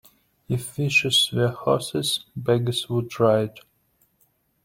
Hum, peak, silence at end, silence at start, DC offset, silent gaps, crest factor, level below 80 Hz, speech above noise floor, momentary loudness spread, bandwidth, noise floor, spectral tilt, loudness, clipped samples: none; -6 dBFS; 1.05 s; 0.5 s; under 0.1%; none; 18 dB; -58 dBFS; 43 dB; 10 LU; 16.5 kHz; -66 dBFS; -4.5 dB/octave; -22 LUFS; under 0.1%